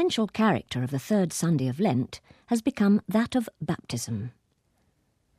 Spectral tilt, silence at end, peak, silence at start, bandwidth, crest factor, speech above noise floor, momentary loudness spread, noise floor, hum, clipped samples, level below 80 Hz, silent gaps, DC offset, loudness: -6 dB/octave; 1.1 s; -10 dBFS; 0 s; 14.5 kHz; 18 dB; 44 dB; 10 LU; -70 dBFS; none; under 0.1%; -62 dBFS; none; under 0.1%; -27 LUFS